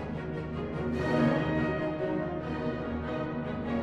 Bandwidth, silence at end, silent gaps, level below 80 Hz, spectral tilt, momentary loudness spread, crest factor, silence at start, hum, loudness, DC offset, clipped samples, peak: 8.6 kHz; 0 s; none; -48 dBFS; -8 dB/octave; 8 LU; 16 dB; 0 s; none; -32 LUFS; under 0.1%; under 0.1%; -16 dBFS